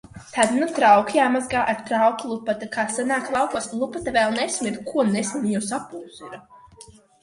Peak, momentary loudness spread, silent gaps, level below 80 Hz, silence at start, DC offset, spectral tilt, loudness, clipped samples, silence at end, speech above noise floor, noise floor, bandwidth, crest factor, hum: -2 dBFS; 14 LU; none; -58 dBFS; 0.15 s; under 0.1%; -4 dB/octave; -22 LUFS; under 0.1%; 0.4 s; 26 dB; -48 dBFS; 11.5 kHz; 20 dB; none